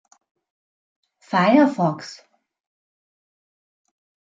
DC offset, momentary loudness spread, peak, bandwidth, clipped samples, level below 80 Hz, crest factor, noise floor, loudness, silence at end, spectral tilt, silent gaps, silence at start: under 0.1%; 18 LU; -2 dBFS; 7.6 kHz; under 0.1%; -74 dBFS; 22 dB; under -90 dBFS; -18 LUFS; 2.25 s; -7 dB/octave; none; 1.3 s